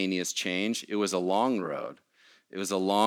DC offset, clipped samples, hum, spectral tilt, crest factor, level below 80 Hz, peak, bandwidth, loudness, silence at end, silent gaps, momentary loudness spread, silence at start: under 0.1%; under 0.1%; none; -3.5 dB/octave; 20 dB; -84 dBFS; -10 dBFS; 17.5 kHz; -29 LUFS; 0 s; none; 10 LU; 0 s